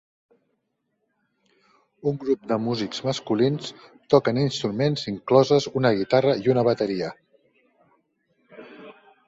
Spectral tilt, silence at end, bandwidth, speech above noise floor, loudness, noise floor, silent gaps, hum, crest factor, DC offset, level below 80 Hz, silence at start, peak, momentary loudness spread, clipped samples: -6.5 dB/octave; 0.35 s; 8 kHz; 53 dB; -23 LUFS; -75 dBFS; none; none; 22 dB; under 0.1%; -62 dBFS; 2.05 s; -4 dBFS; 10 LU; under 0.1%